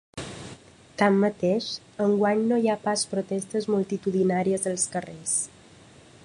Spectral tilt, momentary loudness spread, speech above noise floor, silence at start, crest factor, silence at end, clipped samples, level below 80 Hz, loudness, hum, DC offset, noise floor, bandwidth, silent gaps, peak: -4.5 dB/octave; 15 LU; 27 dB; 0.15 s; 20 dB; 0.8 s; under 0.1%; -62 dBFS; -25 LUFS; none; under 0.1%; -51 dBFS; 11.5 kHz; none; -6 dBFS